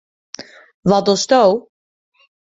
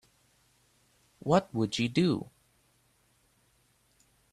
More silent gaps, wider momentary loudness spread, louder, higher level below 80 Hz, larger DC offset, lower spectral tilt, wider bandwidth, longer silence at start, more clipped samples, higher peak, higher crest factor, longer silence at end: first, 0.74-0.83 s vs none; first, 22 LU vs 12 LU; first, -15 LUFS vs -29 LUFS; first, -56 dBFS vs -66 dBFS; neither; second, -4.5 dB/octave vs -6 dB/octave; second, 8 kHz vs 13 kHz; second, 0.4 s vs 1.25 s; neither; first, -2 dBFS vs -10 dBFS; second, 16 dB vs 24 dB; second, 0.95 s vs 2.1 s